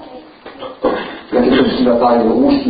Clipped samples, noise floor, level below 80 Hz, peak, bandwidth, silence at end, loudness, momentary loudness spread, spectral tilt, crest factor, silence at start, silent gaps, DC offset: under 0.1%; -35 dBFS; -42 dBFS; -2 dBFS; 5 kHz; 0 s; -14 LUFS; 12 LU; -11 dB/octave; 12 dB; 0 s; none; under 0.1%